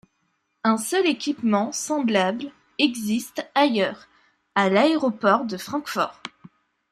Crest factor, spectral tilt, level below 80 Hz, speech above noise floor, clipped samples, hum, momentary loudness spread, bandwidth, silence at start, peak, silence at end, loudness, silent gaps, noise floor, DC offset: 20 dB; -4 dB/octave; -70 dBFS; 50 dB; under 0.1%; none; 9 LU; 15.5 kHz; 0.65 s; -4 dBFS; 0.65 s; -23 LUFS; none; -72 dBFS; under 0.1%